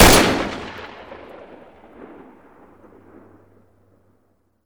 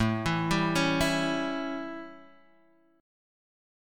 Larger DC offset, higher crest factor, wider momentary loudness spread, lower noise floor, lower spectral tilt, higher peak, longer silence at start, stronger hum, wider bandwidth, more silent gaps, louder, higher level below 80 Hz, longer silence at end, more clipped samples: neither; about the same, 20 dB vs 20 dB; first, 29 LU vs 14 LU; about the same, -64 dBFS vs -64 dBFS; second, -3 dB/octave vs -5 dB/octave; first, -2 dBFS vs -12 dBFS; about the same, 0 s vs 0 s; neither; first, over 20 kHz vs 17 kHz; neither; first, -17 LUFS vs -28 LUFS; first, -32 dBFS vs -50 dBFS; first, 3.5 s vs 1 s; neither